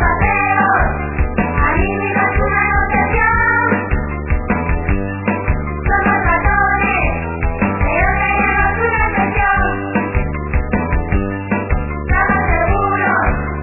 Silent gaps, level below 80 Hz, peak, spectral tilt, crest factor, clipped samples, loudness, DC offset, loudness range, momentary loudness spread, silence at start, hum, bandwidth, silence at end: none; -22 dBFS; -2 dBFS; -11.5 dB/octave; 14 dB; under 0.1%; -15 LUFS; under 0.1%; 2 LU; 6 LU; 0 s; none; 3 kHz; 0 s